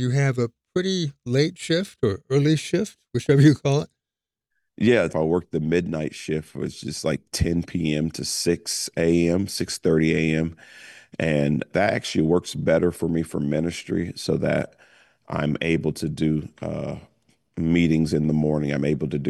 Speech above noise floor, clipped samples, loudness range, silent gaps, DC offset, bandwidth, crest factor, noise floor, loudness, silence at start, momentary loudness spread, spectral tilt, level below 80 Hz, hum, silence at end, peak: 67 dB; under 0.1%; 4 LU; none; under 0.1%; 12.5 kHz; 18 dB; -89 dBFS; -23 LUFS; 0 s; 9 LU; -6 dB/octave; -48 dBFS; none; 0 s; -6 dBFS